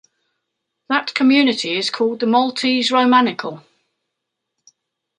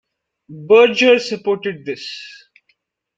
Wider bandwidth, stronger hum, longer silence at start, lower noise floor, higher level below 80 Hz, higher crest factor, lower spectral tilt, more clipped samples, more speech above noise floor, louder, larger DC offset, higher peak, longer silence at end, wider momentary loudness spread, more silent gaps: first, 10.5 kHz vs 7.8 kHz; neither; first, 0.9 s vs 0.5 s; first, -79 dBFS vs -65 dBFS; second, -72 dBFS vs -66 dBFS; about the same, 18 dB vs 16 dB; about the same, -3.5 dB/octave vs -4 dB/octave; neither; first, 62 dB vs 50 dB; about the same, -16 LUFS vs -15 LUFS; neither; about the same, -2 dBFS vs -2 dBFS; first, 1.6 s vs 0.9 s; second, 8 LU vs 22 LU; neither